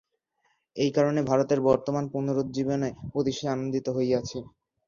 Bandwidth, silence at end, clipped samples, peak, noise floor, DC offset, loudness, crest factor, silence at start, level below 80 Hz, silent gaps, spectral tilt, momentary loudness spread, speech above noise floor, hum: 7.4 kHz; 0.4 s; under 0.1%; -8 dBFS; -73 dBFS; under 0.1%; -27 LUFS; 18 dB; 0.75 s; -58 dBFS; none; -6.5 dB/octave; 7 LU; 47 dB; none